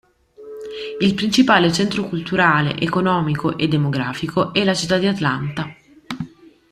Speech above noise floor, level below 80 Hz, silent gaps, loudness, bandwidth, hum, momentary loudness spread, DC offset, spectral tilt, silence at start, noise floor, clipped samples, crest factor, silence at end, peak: 23 dB; -52 dBFS; none; -18 LUFS; 13.5 kHz; none; 16 LU; under 0.1%; -5.5 dB/octave; 0.4 s; -41 dBFS; under 0.1%; 18 dB; 0.45 s; -2 dBFS